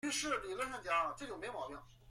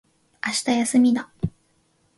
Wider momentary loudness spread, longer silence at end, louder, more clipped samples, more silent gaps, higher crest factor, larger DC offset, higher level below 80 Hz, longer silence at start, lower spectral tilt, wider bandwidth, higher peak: about the same, 11 LU vs 13 LU; second, 0 s vs 0.7 s; second, -39 LUFS vs -22 LUFS; neither; neither; about the same, 18 dB vs 16 dB; neither; second, -64 dBFS vs -50 dBFS; second, 0.05 s vs 0.45 s; second, -2 dB/octave vs -4 dB/octave; first, 16 kHz vs 11.5 kHz; second, -22 dBFS vs -8 dBFS